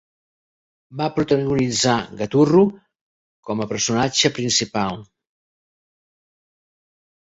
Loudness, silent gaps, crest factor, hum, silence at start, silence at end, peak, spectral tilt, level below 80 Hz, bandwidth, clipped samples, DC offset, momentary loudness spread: -19 LUFS; 3.01-3.43 s; 20 dB; none; 0.9 s; 2.2 s; -2 dBFS; -4 dB/octave; -54 dBFS; 8 kHz; under 0.1%; under 0.1%; 11 LU